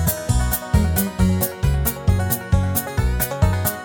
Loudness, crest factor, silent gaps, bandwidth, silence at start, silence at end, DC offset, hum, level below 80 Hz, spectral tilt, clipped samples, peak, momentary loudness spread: -20 LUFS; 16 dB; none; 19.5 kHz; 0 s; 0 s; under 0.1%; none; -24 dBFS; -5.5 dB/octave; under 0.1%; -4 dBFS; 2 LU